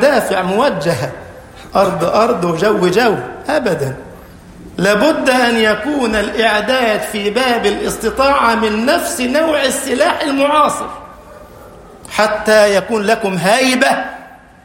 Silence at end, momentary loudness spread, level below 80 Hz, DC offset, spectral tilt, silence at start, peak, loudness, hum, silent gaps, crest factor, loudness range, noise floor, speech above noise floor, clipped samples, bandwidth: 0.3 s; 9 LU; -42 dBFS; under 0.1%; -4 dB/octave; 0 s; 0 dBFS; -14 LUFS; none; none; 14 dB; 2 LU; -37 dBFS; 23 dB; under 0.1%; 16.5 kHz